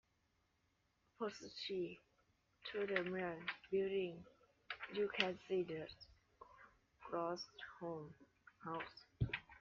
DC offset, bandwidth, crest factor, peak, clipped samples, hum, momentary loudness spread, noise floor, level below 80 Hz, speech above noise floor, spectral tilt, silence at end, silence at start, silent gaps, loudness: under 0.1%; 7.2 kHz; 28 dB; -18 dBFS; under 0.1%; none; 21 LU; -82 dBFS; -68 dBFS; 38 dB; -3.5 dB/octave; 0.05 s; 1.2 s; none; -45 LUFS